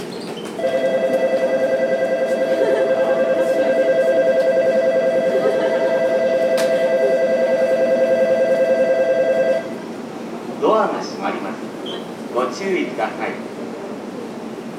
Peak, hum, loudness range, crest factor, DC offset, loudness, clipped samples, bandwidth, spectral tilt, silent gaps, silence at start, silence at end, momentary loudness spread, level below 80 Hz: -4 dBFS; none; 6 LU; 14 dB; under 0.1%; -18 LUFS; under 0.1%; 13 kHz; -5 dB/octave; none; 0 s; 0 s; 13 LU; -70 dBFS